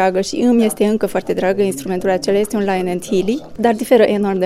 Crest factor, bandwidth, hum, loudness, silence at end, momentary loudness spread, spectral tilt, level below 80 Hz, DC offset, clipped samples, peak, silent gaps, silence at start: 16 dB; 15.5 kHz; none; -16 LUFS; 0 s; 6 LU; -5.5 dB/octave; -48 dBFS; under 0.1%; under 0.1%; 0 dBFS; none; 0 s